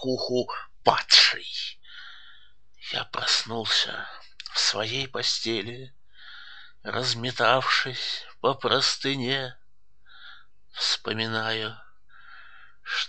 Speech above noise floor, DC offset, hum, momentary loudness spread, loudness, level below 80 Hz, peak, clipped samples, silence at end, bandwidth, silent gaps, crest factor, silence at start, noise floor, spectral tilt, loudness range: 39 dB; 0.5%; none; 22 LU; -24 LUFS; -66 dBFS; -2 dBFS; under 0.1%; 0 s; 9.4 kHz; none; 26 dB; 0 s; -65 dBFS; -2 dB/octave; 6 LU